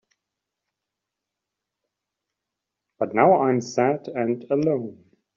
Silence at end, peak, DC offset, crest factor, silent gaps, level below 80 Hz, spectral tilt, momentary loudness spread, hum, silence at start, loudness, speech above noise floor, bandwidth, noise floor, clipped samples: 0.4 s; -4 dBFS; under 0.1%; 22 dB; none; -70 dBFS; -6.5 dB/octave; 11 LU; none; 3 s; -22 LUFS; 63 dB; 7.6 kHz; -85 dBFS; under 0.1%